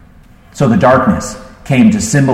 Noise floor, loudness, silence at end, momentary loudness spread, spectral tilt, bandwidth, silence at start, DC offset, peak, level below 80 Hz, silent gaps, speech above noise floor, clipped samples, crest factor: -40 dBFS; -11 LUFS; 0 s; 13 LU; -6 dB/octave; 14.5 kHz; 0.55 s; under 0.1%; 0 dBFS; -36 dBFS; none; 31 dB; under 0.1%; 12 dB